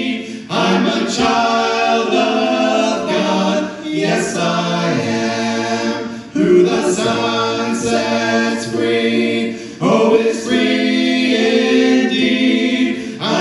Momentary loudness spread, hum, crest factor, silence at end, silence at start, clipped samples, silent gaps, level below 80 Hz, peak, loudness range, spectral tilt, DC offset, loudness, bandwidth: 7 LU; none; 14 dB; 0 s; 0 s; under 0.1%; none; -54 dBFS; 0 dBFS; 3 LU; -4.5 dB/octave; under 0.1%; -15 LUFS; 12 kHz